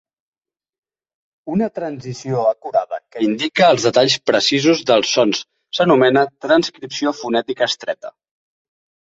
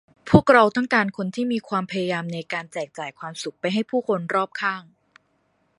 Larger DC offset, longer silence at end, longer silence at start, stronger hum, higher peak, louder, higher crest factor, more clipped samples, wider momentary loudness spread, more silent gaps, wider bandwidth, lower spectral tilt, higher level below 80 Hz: neither; first, 1.1 s vs 0.95 s; first, 1.45 s vs 0.25 s; neither; about the same, 0 dBFS vs 0 dBFS; first, -17 LUFS vs -22 LUFS; about the same, 18 dB vs 22 dB; neither; second, 13 LU vs 16 LU; neither; second, 8 kHz vs 11.5 kHz; second, -4 dB/octave vs -6 dB/octave; second, -60 dBFS vs -50 dBFS